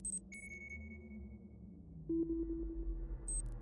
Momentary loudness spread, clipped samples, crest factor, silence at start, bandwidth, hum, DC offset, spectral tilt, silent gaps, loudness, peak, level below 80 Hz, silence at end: 15 LU; under 0.1%; 14 dB; 0 s; 11.5 kHz; none; under 0.1%; -6 dB/octave; none; -44 LUFS; -30 dBFS; -48 dBFS; 0 s